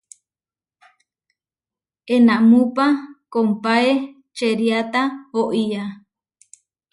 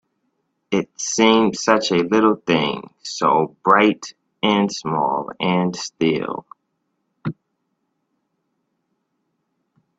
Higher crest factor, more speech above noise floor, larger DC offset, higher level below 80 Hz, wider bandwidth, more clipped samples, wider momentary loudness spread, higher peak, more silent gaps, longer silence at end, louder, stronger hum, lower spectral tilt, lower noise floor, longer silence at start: about the same, 16 dB vs 20 dB; first, over 73 dB vs 54 dB; neither; second, -70 dBFS vs -62 dBFS; first, 11.5 kHz vs 8.4 kHz; neither; second, 11 LU vs 16 LU; second, -4 dBFS vs 0 dBFS; neither; second, 1 s vs 2.65 s; about the same, -18 LUFS vs -19 LUFS; neither; first, -6 dB/octave vs -4.5 dB/octave; first, under -90 dBFS vs -73 dBFS; first, 2.05 s vs 0.7 s